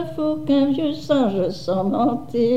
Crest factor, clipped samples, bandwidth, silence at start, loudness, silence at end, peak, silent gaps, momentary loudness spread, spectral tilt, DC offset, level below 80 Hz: 14 dB; under 0.1%; 8.8 kHz; 0 s; -21 LUFS; 0 s; -6 dBFS; none; 5 LU; -7.5 dB/octave; 1%; -52 dBFS